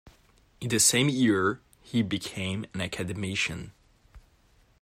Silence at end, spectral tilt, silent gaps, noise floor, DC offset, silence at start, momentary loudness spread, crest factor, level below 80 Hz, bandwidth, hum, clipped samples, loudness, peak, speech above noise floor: 0.6 s; -3.5 dB/octave; none; -62 dBFS; under 0.1%; 0.6 s; 16 LU; 22 dB; -58 dBFS; 16 kHz; none; under 0.1%; -27 LUFS; -8 dBFS; 35 dB